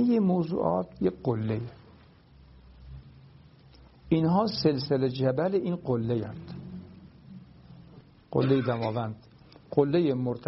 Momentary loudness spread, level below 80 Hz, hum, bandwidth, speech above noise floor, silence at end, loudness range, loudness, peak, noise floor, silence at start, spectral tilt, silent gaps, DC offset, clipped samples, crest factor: 23 LU; -58 dBFS; none; 5.8 kHz; 28 dB; 0.05 s; 5 LU; -28 LUFS; -8 dBFS; -55 dBFS; 0 s; -7 dB/octave; none; under 0.1%; under 0.1%; 20 dB